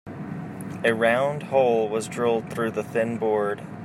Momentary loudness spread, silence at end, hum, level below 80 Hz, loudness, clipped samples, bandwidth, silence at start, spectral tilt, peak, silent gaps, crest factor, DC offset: 14 LU; 0 s; none; -64 dBFS; -24 LUFS; under 0.1%; 15 kHz; 0.05 s; -5.5 dB/octave; -6 dBFS; none; 18 dB; under 0.1%